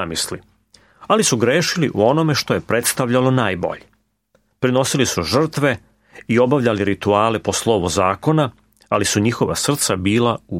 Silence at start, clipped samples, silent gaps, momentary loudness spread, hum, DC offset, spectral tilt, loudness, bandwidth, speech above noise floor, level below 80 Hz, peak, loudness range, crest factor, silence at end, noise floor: 0 s; under 0.1%; none; 7 LU; none; under 0.1%; -4.5 dB/octave; -18 LUFS; 16.5 kHz; 45 dB; -50 dBFS; -2 dBFS; 2 LU; 16 dB; 0 s; -62 dBFS